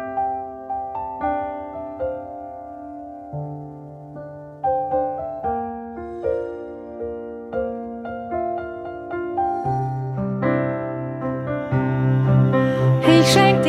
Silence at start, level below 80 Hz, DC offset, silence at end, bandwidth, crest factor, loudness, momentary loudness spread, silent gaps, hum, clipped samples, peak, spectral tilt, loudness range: 0 s; -50 dBFS; under 0.1%; 0 s; 13.5 kHz; 20 dB; -23 LUFS; 18 LU; none; none; under 0.1%; -2 dBFS; -6.5 dB/octave; 9 LU